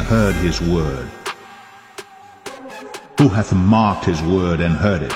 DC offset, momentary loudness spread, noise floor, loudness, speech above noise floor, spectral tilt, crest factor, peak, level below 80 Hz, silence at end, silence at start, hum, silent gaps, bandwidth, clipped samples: under 0.1%; 21 LU; -41 dBFS; -17 LUFS; 25 dB; -6.5 dB/octave; 18 dB; 0 dBFS; -34 dBFS; 0 s; 0 s; none; none; 15.5 kHz; under 0.1%